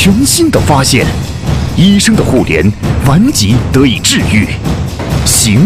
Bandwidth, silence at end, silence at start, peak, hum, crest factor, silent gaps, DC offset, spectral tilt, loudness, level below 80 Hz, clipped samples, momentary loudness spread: 16 kHz; 0 s; 0 s; 0 dBFS; none; 8 dB; none; under 0.1%; -4.5 dB/octave; -9 LUFS; -22 dBFS; 0.4%; 8 LU